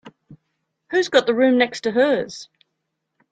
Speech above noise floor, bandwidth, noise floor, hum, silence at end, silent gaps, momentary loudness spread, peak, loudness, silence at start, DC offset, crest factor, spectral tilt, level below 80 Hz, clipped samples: 59 dB; 9.2 kHz; -77 dBFS; none; 0.85 s; none; 10 LU; -2 dBFS; -19 LUFS; 0.05 s; under 0.1%; 20 dB; -4 dB/octave; -68 dBFS; under 0.1%